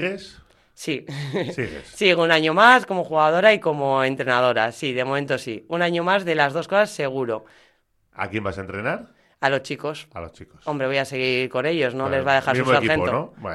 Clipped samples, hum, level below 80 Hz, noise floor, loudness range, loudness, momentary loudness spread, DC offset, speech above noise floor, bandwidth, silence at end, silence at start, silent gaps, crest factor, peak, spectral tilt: under 0.1%; none; -56 dBFS; -63 dBFS; 9 LU; -21 LUFS; 14 LU; under 0.1%; 41 dB; 13 kHz; 0 s; 0 s; none; 20 dB; -2 dBFS; -5 dB/octave